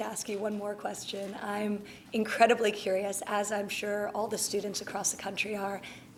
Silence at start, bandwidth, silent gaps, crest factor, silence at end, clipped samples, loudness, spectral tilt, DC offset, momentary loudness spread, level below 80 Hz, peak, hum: 0 s; 18 kHz; none; 24 dB; 0 s; under 0.1%; -32 LUFS; -3 dB/octave; under 0.1%; 11 LU; -70 dBFS; -8 dBFS; none